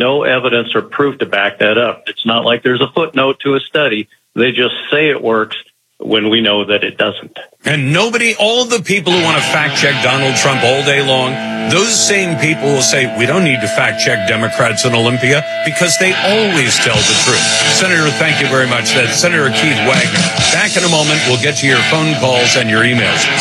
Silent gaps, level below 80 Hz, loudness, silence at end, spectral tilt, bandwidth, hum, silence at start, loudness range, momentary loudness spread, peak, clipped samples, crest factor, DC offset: none; -54 dBFS; -11 LUFS; 0 s; -3 dB/octave; 15 kHz; none; 0 s; 4 LU; 6 LU; 0 dBFS; under 0.1%; 12 dB; under 0.1%